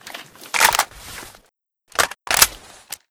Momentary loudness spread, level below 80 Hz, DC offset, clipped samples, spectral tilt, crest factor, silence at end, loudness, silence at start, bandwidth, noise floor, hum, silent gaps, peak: 21 LU; -48 dBFS; under 0.1%; under 0.1%; 1 dB/octave; 22 dB; 0.55 s; -18 LUFS; 0.05 s; over 20 kHz; -63 dBFS; none; none; 0 dBFS